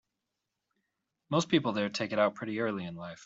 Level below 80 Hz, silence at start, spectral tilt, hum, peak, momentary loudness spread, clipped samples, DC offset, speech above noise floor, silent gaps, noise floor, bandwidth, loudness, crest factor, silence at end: -72 dBFS; 1.3 s; -5 dB/octave; none; -12 dBFS; 7 LU; under 0.1%; under 0.1%; 55 dB; none; -86 dBFS; 8 kHz; -31 LUFS; 20 dB; 0 s